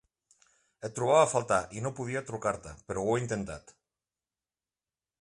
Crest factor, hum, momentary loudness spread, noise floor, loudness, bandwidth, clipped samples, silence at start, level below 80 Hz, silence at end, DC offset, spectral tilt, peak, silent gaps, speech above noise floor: 22 dB; none; 16 LU; under -90 dBFS; -30 LUFS; 11.5 kHz; under 0.1%; 0.8 s; -60 dBFS; 1.6 s; under 0.1%; -5 dB/octave; -10 dBFS; none; over 60 dB